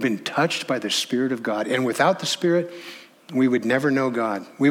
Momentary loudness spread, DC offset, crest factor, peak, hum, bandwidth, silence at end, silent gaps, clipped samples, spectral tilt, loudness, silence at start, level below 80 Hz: 8 LU; under 0.1%; 18 dB; -4 dBFS; none; 16.5 kHz; 0 s; none; under 0.1%; -4.5 dB/octave; -22 LUFS; 0 s; -74 dBFS